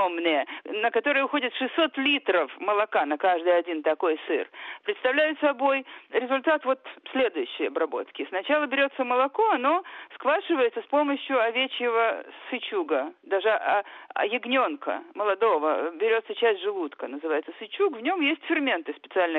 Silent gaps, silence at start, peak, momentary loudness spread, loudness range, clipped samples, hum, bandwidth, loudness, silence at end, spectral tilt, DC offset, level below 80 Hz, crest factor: none; 0 s; -10 dBFS; 8 LU; 2 LU; under 0.1%; none; 4.2 kHz; -26 LUFS; 0 s; -5.5 dB/octave; under 0.1%; -78 dBFS; 16 dB